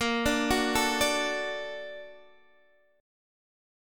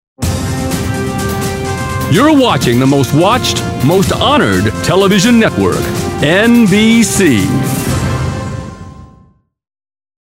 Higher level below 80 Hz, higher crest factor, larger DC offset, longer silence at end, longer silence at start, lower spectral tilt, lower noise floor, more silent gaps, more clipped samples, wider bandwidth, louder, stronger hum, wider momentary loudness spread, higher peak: second, -50 dBFS vs -32 dBFS; first, 18 dB vs 12 dB; neither; second, 1 s vs 1.15 s; second, 0 s vs 0.2 s; second, -2.5 dB/octave vs -5 dB/octave; first, -65 dBFS vs -47 dBFS; neither; neither; about the same, 17.5 kHz vs 16.5 kHz; second, -27 LUFS vs -11 LUFS; neither; first, 17 LU vs 9 LU; second, -12 dBFS vs 0 dBFS